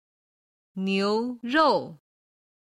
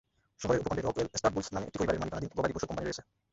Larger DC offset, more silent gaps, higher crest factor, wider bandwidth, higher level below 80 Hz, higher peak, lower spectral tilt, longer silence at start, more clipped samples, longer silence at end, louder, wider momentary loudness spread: neither; neither; about the same, 18 dB vs 20 dB; first, 11.5 kHz vs 8 kHz; second, -70 dBFS vs -52 dBFS; about the same, -10 dBFS vs -12 dBFS; about the same, -6 dB/octave vs -5 dB/octave; first, 0.75 s vs 0.4 s; neither; first, 0.8 s vs 0.3 s; first, -25 LUFS vs -33 LUFS; first, 17 LU vs 7 LU